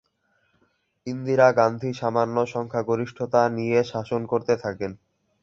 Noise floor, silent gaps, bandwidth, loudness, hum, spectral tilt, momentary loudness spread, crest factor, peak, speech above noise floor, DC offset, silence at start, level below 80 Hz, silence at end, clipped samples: -69 dBFS; none; 7.6 kHz; -24 LUFS; none; -7 dB/octave; 13 LU; 20 dB; -4 dBFS; 46 dB; under 0.1%; 1.05 s; -62 dBFS; 0.5 s; under 0.1%